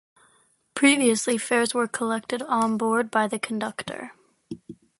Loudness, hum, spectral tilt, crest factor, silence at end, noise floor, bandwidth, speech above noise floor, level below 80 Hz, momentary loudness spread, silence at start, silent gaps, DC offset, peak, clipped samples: -23 LUFS; none; -3 dB/octave; 20 dB; 0.25 s; -63 dBFS; 11.5 kHz; 40 dB; -70 dBFS; 21 LU; 0.75 s; none; under 0.1%; -6 dBFS; under 0.1%